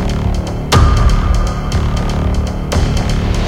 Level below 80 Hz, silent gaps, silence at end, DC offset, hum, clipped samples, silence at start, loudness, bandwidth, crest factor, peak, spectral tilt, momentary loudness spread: -16 dBFS; none; 0 s; under 0.1%; none; under 0.1%; 0 s; -15 LUFS; 15 kHz; 12 dB; 0 dBFS; -6 dB/octave; 6 LU